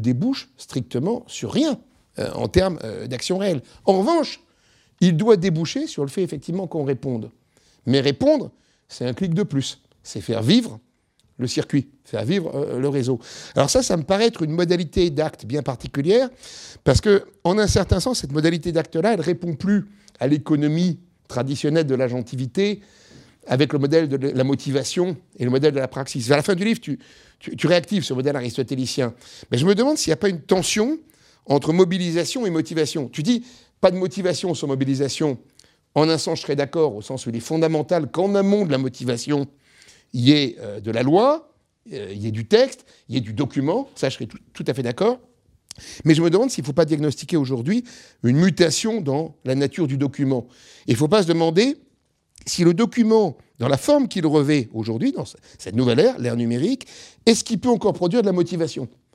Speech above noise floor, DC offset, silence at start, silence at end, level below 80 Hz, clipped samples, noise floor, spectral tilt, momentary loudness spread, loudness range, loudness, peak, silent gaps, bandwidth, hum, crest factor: 44 dB; under 0.1%; 0 s; 0.25 s; -46 dBFS; under 0.1%; -64 dBFS; -5.5 dB/octave; 12 LU; 3 LU; -21 LUFS; 0 dBFS; none; 15 kHz; none; 20 dB